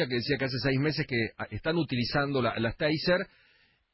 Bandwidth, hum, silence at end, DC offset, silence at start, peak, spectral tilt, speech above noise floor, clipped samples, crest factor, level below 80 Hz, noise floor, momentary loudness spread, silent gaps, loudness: 5.8 kHz; none; 0.65 s; under 0.1%; 0 s; -14 dBFS; -9.5 dB/octave; 37 dB; under 0.1%; 14 dB; -52 dBFS; -65 dBFS; 3 LU; none; -29 LUFS